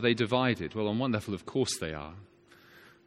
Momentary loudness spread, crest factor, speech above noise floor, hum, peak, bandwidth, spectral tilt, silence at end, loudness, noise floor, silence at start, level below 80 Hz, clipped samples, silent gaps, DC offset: 11 LU; 20 dB; 27 dB; none; -12 dBFS; 16 kHz; -5 dB/octave; 0.25 s; -31 LUFS; -57 dBFS; 0 s; -60 dBFS; under 0.1%; none; under 0.1%